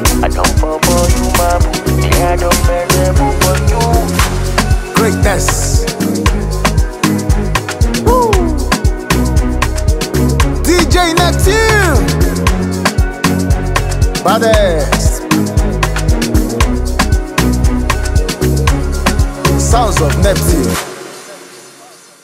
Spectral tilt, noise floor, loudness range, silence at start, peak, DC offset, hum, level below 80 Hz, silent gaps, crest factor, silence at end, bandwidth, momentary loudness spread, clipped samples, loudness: -5 dB/octave; -38 dBFS; 2 LU; 0 s; 0 dBFS; under 0.1%; none; -16 dBFS; none; 12 dB; 0.4 s; 16.5 kHz; 4 LU; under 0.1%; -12 LUFS